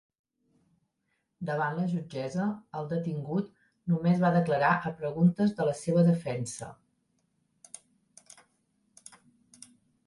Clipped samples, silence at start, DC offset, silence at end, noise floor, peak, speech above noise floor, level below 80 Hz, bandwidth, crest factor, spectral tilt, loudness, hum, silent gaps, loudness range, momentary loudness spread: under 0.1%; 1.4 s; under 0.1%; 3.3 s; -79 dBFS; -12 dBFS; 51 dB; -68 dBFS; 11.5 kHz; 18 dB; -7 dB/octave; -29 LUFS; none; none; 8 LU; 17 LU